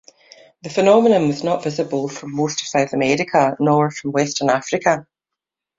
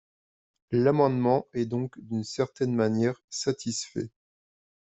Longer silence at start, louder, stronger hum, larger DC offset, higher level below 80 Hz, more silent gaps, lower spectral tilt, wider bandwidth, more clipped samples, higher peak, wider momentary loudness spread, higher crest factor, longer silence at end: about the same, 0.65 s vs 0.7 s; first, -18 LUFS vs -28 LUFS; neither; neither; first, -60 dBFS vs -66 dBFS; second, none vs 3.24-3.28 s; about the same, -5 dB/octave vs -6 dB/octave; about the same, 7.8 kHz vs 8.2 kHz; neither; first, -2 dBFS vs -10 dBFS; about the same, 10 LU vs 10 LU; about the same, 18 dB vs 18 dB; about the same, 0.75 s vs 0.85 s